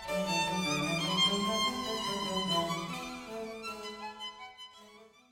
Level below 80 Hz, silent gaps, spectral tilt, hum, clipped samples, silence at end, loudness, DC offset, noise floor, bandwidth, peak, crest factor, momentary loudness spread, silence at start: -62 dBFS; none; -3 dB/octave; none; under 0.1%; 0.25 s; -32 LUFS; under 0.1%; -57 dBFS; 19 kHz; -18 dBFS; 16 dB; 16 LU; 0 s